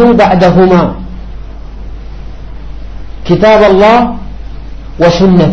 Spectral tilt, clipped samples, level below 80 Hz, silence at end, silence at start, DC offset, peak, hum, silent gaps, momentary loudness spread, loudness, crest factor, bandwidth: -7.5 dB/octave; 0.4%; -24 dBFS; 0 s; 0 s; 3%; 0 dBFS; none; none; 23 LU; -6 LUFS; 8 dB; 7.4 kHz